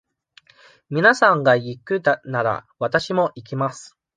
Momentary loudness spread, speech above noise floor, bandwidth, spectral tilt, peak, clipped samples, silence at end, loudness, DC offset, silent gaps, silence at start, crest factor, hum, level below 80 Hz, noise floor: 11 LU; 35 dB; 9.6 kHz; -5.5 dB/octave; -2 dBFS; under 0.1%; 0.3 s; -20 LUFS; under 0.1%; none; 0.9 s; 20 dB; none; -64 dBFS; -55 dBFS